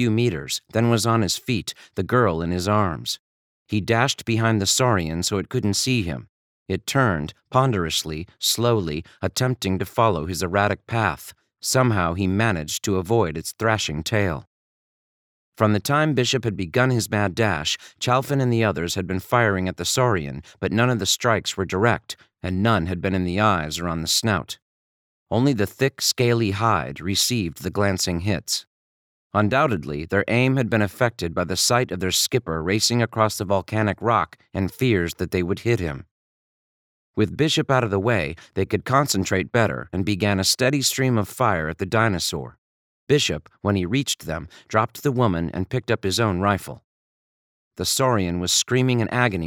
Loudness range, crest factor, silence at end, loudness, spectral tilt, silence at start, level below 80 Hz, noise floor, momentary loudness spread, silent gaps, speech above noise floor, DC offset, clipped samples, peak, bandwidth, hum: 3 LU; 20 dB; 0 s; -22 LUFS; -4.5 dB/octave; 0 s; -48 dBFS; under -90 dBFS; 8 LU; 3.19-3.66 s, 6.29-6.66 s, 14.47-15.52 s, 24.62-25.26 s, 28.67-29.30 s, 36.11-37.14 s, 42.58-43.07 s, 46.84-47.71 s; over 68 dB; under 0.1%; under 0.1%; -2 dBFS; 19 kHz; none